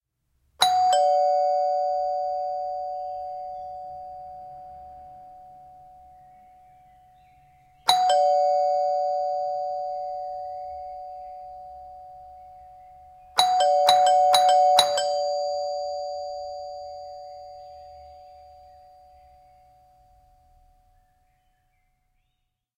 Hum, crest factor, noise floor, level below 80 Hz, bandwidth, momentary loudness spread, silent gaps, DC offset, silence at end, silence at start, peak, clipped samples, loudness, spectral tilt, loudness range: none; 26 dB; -77 dBFS; -64 dBFS; 15.5 kHz; 25 LU; none; under 0.1%; 4.4 s; 0.6 s; 0 dBFS; under 0.1%; -23 LUFS; 0 dB/octave; 21 LU